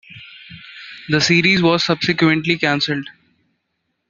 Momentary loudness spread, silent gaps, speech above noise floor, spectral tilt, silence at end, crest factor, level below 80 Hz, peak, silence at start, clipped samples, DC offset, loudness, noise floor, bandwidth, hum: 24 LU; none; 56 dB; -4.5 dB/octave; 1 s; 18 dB; -56 dBFS; -2 dBFS; 0.1 s; under 0.1%; under 0.1%; -16 LUFS; -72 dBFS; 7.6 kHz; none